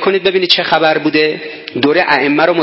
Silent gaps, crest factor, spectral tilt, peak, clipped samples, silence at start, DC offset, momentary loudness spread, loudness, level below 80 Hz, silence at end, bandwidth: none; 12 dB; -5.5 dB/octave; 0 dBFS; under 0.1%; 0 s; under 0.1%; 6 LU; -12 LUFS; -56 dBFS; 0 s; 8 kHz